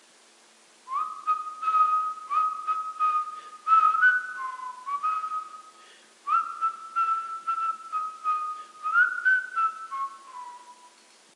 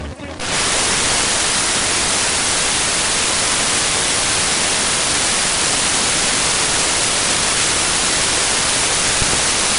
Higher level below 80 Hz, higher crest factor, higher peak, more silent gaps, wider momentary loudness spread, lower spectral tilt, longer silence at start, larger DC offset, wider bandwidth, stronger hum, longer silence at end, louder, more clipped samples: second, under -90 dBFS vs -36 dBFS; about the same, 18 dB vs 16 dB; second, -10 dBFS vs 0 dBFS; neither; first, 14 LU vs 1 LU; second, 1.5 dB/octave vs -0.5 dB/octave; first, 0.85 s vs 0 s; neither; about the same, 11.5 kHz vs 11.5 kHz; neither; first, 0.5 s vs 0 s; second, -26 LUFS vs -14 LUFS; neither